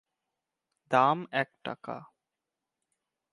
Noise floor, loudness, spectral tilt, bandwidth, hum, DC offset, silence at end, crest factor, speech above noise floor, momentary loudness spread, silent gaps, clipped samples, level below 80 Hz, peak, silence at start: -88 dBFS; -28 LUFS; -6 dB/octave; 11 kHz; none; under 0.1%; 1.25 s; 24 dB; 59 dB; 17 LU; none; under 0.1%; -82 dBFS; -10 dBFS; 0.9 s